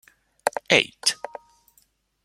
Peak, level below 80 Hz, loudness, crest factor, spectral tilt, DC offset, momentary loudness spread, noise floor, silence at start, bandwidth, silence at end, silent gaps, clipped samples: -2 dBFS; -66 dBFS; -22 LUFS; 26 dB; -1.5 dB/octave; under 0.1%; 20 LU; -64 dBFS; 0.45 s; 16.5 kHz; 1.1 s; none; under 0.1%